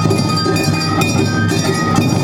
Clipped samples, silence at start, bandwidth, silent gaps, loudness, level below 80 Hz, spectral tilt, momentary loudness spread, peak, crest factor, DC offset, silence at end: under 0.1%; 0 s; 17 kHz; none; -15 LUFS; -40 dBFS; -5 dB/octave; 1 LU; 0 dBFS; 14 dB; under 0.1%; 0 s